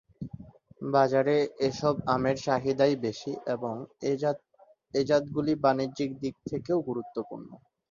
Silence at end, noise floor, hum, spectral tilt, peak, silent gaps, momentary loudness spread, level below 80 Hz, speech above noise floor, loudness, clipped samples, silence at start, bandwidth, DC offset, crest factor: 0.35 s; -47 dBFS; none; -6.5 dB/octave; -8 dBFS; none; 14 LU; -62 dBFS; 19 dB; -29 LUFS; under 0.1%; 0.2 s; 7.4 kHz; under 0.1%; 20 dB